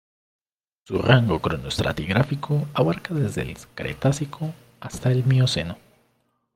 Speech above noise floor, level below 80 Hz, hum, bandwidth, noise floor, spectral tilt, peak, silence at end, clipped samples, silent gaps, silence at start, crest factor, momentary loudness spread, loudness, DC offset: 46 dB; -48 dBFS; none; 13 kHz; -69 dBFS; -6 dB/octave; -2 dBFS; 0.8 s; under 0.1%; none; 0.9 s; 22 dB; 15 LU; -23 LUFS; under 0.1%